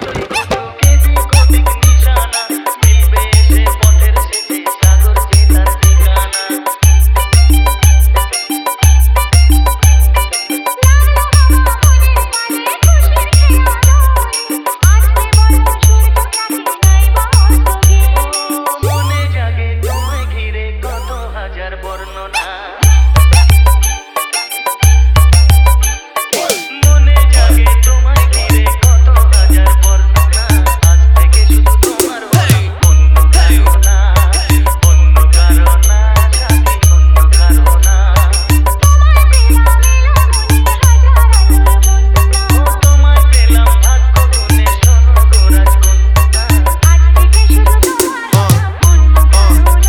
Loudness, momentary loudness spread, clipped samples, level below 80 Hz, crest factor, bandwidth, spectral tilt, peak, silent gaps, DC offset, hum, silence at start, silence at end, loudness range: -10 LUFS; 8 LU; 0.6%; -8 dBFS; 8 dB; 17 kHz; -4.5 dB/octave; 0 dBFS; none; under 0.1%; none; 0 s; 0 s; 3 LU